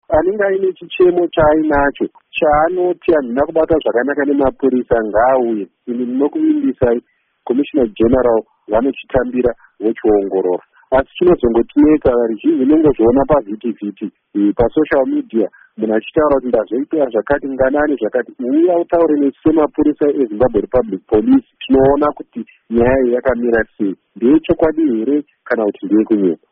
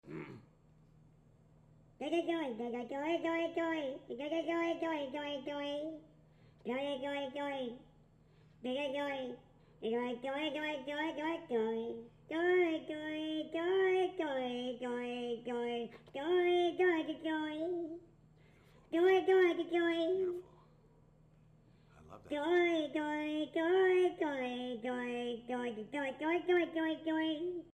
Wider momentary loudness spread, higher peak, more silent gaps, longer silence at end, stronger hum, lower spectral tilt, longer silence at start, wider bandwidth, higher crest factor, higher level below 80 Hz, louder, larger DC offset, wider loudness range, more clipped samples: second, 8 LU vs 12 LU; first, -2 dBFS vs -20 dBFS; neither; about the same, 0.15 s vs 0.05 s; neither; about the same, -6 dB/octave vs -5 dB/octave; about the same, 0.1 s vs 0.05 s; second, 3.8 kHz vs 9.2 kHz; about the same, 12 dB vs 16 dB; first, -36 dBFS vs -72 dBFS; first, -15 LUFS vs -36 LUFS; neither; second, 3 LU vs 7 LU; neither